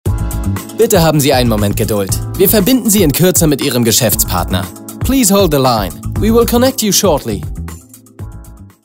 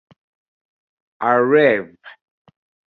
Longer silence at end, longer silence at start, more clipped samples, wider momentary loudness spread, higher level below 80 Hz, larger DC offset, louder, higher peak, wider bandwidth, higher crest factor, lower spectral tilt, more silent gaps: second, 0.15 s vs 0.75 s; second, 0.05 s vs 1.2 s; neither; about the same, 12 LU vs 12 LU; first, -26 dBFS vs -68 dBFS; neither; first, -12 LUFS vs -16 LUFS; about the same, 0 dBFS vs -2 dBFS; first, 16.5 kHz vs 4.4 kHz; second, 12 dB vs 18 dB; second, -4.5 dB/octave vs -8 dB/octave; neither